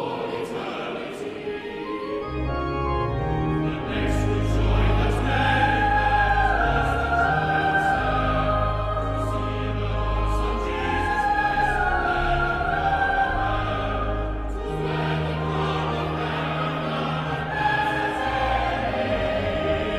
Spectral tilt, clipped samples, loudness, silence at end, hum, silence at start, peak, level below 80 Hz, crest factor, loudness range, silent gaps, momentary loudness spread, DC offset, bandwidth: -6.5 dB/octave; under 0.1%; -24 LUFS; 0 s; none; 0 s; -8 dBFS; -30 dBFS; 14 dB; 5 LU; none; 9 LU; under 0.1%; 11.5 kHz